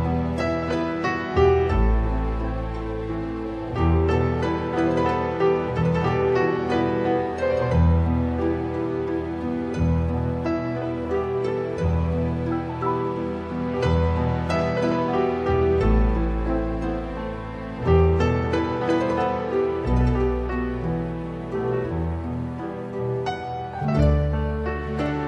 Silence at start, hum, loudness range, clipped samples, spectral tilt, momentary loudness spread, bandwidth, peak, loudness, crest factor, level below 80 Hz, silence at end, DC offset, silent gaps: 0 s; none; 3 LU; under 0.1%; -8.5 dB/octave; 9 LU; 8.4 kHz; -6 dBFS; -24 LUFS; 16 dB; -32 dBFS; 0 s; under 0.1%; none